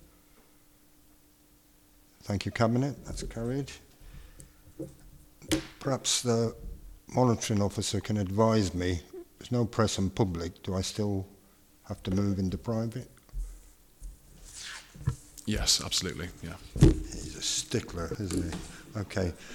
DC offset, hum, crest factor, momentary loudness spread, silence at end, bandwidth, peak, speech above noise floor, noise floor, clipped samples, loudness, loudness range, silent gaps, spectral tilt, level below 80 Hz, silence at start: under 0.1%; none; 26 dB; 20 LU; 0 s; 19 kHz; -6 dBFS; 32 dB; -61 dBFS; under 0.1%; -30 LUFS; 7 LU; none; -4.5 dB/octave; -42 dBFS; 2.25 s